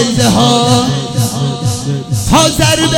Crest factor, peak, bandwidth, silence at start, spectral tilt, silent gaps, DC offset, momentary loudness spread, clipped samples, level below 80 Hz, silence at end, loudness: 12 dB; 0 dBFS; 18.5 kHz; 0 s; -4.5 dB/octave; none; under 0.1%; 8 LU; 0.6%; -30 dBFS; 0 s; -11 LUFS